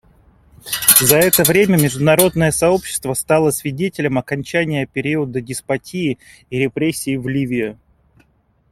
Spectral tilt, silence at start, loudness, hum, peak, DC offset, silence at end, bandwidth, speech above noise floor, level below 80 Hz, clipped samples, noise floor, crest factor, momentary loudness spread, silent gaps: -4 dB/octave; 0.65 s; -16 LUFS; none; 0 dBFS; under 0.1%; 1 s; 16.5 kHz; 42 dB; -46 dBFS; under 0.1%; -59 dBFS; 18 dB; 12 LU; none